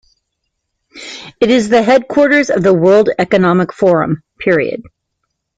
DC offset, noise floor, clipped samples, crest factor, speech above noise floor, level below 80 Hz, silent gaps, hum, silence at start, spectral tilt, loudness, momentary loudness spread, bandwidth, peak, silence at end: under 0.1%; -72 dBFS; under 0.1%; 12 dB; 61 dB; -50 dBFS; none; none; 0.95 s; -6 dB/octave; -12 LUFS; 18 LU; 9.2 kHz; 0 dBFS; 0.75 s